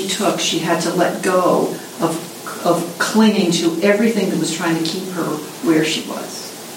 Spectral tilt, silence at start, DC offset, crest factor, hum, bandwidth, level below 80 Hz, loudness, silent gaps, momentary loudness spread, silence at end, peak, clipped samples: -4 dB/octave; 0 s; under 0.1%; 16 dB; none; 16.5 kHz; -68 dBFS; -18 LUFS; none; 9 LU; 0 s; -2 dBFS; under 0.1%